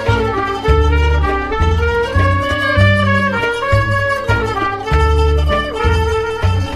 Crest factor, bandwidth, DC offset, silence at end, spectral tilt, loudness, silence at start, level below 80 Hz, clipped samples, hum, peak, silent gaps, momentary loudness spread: 14 dB; 11.5 kHz; under 0.1%; 0 s; -6.5 dB/octave; -15 LUFS; 0 s; -20 dBFS; under 0.1%; none; 0 dBFS; none; 4 LU